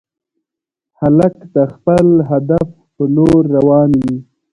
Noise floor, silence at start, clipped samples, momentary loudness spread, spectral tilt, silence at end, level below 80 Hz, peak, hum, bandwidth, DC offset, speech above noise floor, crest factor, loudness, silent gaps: -84 dBFS; 1 s; under 0.1%; 9 LU; -10 dB/octave; 0.3 s; -40 dBFS; 0 dBFS; none; 11 kHz; under 0.1%; 73 dB; 14 dB; -12 LUFS; none